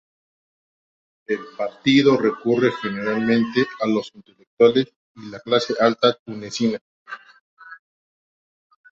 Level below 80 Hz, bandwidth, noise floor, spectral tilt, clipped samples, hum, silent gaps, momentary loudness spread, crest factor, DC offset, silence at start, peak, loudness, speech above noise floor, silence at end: -64 dBFS; 7.8 kHz; under -90 dBFS; -5.5 dB/octave; under 0.1%; none; 4.47-4.57 s, 4.96-5.15 s, 6.19-6.26 s, 6.81-7.05 s, 7.40-7.57 s; 21 LU; 20 dB; under 0.1%; 1.3 s; -2 dBFS; -20 LUFS; over 70 dB; 1.15 s